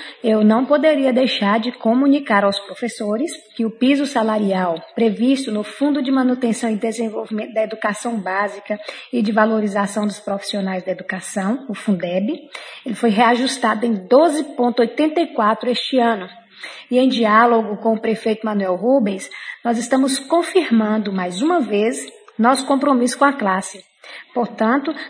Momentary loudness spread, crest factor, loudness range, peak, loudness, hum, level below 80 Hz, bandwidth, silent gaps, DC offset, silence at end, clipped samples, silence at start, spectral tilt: 10 LU; 18 dB; 4 LU; 0 dBFS; -18 LUFS; none; -72 dBFS; 10.5 kHz; none; under 0.1%; 0 s; under 0.1%; 0 s; -5 dB/octave